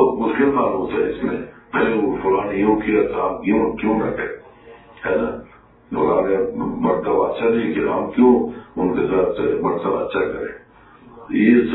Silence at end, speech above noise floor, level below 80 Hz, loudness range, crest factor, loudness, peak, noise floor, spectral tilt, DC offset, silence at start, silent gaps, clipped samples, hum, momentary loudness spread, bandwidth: 0 s; 28 dB; -46 dBFS; 3 LU; 18 dB; -19 LUFS; -2 dBFS; -46 dBFS; -11 dB/octave; under 0.1%; 0 s; none; under 0.1%; none; 11 LU; 4.1 kHz